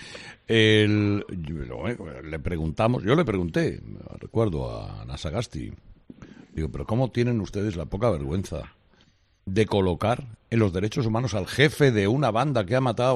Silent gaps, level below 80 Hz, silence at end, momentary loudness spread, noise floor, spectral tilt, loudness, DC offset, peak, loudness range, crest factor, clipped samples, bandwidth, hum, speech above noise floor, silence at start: none; -46 dBFS; 0 s; 15 LU; -61 dBFS; -6.5 dB/octave; -25 LUFS; under 0.1%; -4 dBFS; 7 LU; 20 dB; under 0.1%; 12.5 kHz; none; 37 dB; 0 s